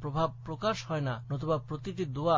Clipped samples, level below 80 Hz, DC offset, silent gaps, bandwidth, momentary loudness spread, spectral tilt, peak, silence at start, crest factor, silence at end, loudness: under 0.1%; -56 dBFS; under 0.1%; none; 7.6 kHz; 4 LU; -6.5 dB/octave; -16 dBFS; 0 s; 16 dB; 0 s; -34 LUFS